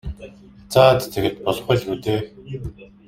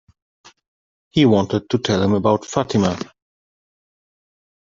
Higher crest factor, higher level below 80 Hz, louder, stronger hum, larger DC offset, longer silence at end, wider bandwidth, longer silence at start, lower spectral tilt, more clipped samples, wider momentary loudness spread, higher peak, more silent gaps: about the same, 20 dB vs 18 dB; first, -42 dBFS vs -56 dBFS; about the same, -19 LUFS vs -18 LUFS; neither; neither; second, 0.2 s vs 1.65 s; first, 16.5 kHz vs 7.6 kHz; second, 0.05 s vs 1.15 s; about the same, -6 dB/octave vs -6 dB/octave; neither; first, 20 LU vs 8 LU; about the same, -2 dBFS vs -2 dBFS; neither